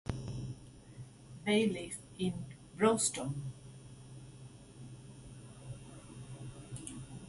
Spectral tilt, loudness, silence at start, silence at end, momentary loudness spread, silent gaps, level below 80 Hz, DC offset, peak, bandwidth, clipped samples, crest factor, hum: -4.5 dB/octave; -36 LUFS; 0.05 s; 0 s; 22 LU; none; -60 dBFS; under 0.1%; -16 dBFS; 11.5 kHz; under 0.1%; 22 dB; none